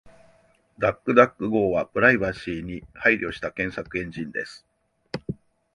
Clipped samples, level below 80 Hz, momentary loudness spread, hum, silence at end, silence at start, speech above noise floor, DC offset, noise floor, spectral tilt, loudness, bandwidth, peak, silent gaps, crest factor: under 0.1%; -52 dBFS; 17 LU; none; 0.4 s; 0.05 s; 37 dB; under 0.1%; -60 dBFS; -7 dB/octave; -23 LUFS; 11 kHz; -2 dBFS; none; 24 dB